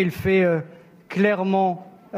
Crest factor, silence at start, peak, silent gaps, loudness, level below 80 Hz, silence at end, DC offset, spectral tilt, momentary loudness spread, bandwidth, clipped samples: 16 dB; 0 s; -6 dBFS; none; -21 LUFS; -54 dBFS; 0 s; under 0.1%; -7.5 dB/octave; 13 LU; 15.5 kHz; under 0.1%